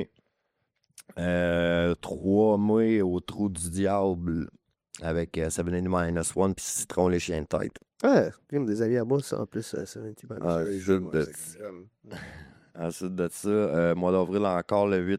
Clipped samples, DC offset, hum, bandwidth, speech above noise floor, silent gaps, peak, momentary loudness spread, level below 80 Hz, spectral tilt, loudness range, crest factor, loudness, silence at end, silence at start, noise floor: under 0.1%; under 0.1%; none; 16 kHz; 51 dB; none; -10 dBFS; 16 LU; -52 dBFS; -6 dB/octave; 6 LU; 18 dB; -27 LUFS; 0 s; 0 s; -78 dBFS